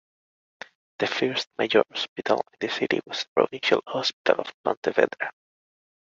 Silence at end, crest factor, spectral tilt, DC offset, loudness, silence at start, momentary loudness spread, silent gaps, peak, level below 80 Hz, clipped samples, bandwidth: 0.8 s; 24 dB; -4 dB/octave; under 0.1%; -25 LUFS; 1 s; 11 LU; 2.08-2.16 s, 3.28-3.36 s, 4.13-4.25 s, 4.54-4.64 s, 4.77-4.83 s; -2 dBFS; -72 dBFS; under 0.1%; 7.6 kHz